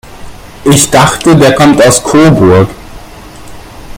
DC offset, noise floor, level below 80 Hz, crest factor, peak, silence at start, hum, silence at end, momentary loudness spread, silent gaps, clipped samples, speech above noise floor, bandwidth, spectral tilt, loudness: under 0.1%; -28 dBFS; -30 dBFS; 8 dB; 0 dBFS; 0.05 s; none; 0 s; 4 LU; none; 3%; 24 dB; over 20 kHz; -5 dB/octave; -6 LUFS